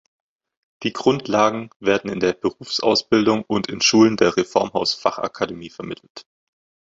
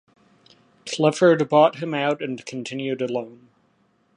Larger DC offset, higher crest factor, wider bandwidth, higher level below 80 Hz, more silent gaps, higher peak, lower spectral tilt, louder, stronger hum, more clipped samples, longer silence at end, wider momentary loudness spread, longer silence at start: neither; about the same, 18 dB vs 18 dB; second, 7.8 kHz vs 11 kHz; first, -56 dBFS vs -74 dBFS; first, 1.76-1.80 s, 6.10-6.15 s vs none; about the same, -2 dBFS vs -4 dBFS; second, -4 dB/octave vs -5.5 dB/octave; about the same, -20 LUFS vs -22 LUFS; neither; neither; second, 0.65 s vs 0.8 s; second, 12 LU vs 15 LU; about the same, 0.8 s vs 0.85 s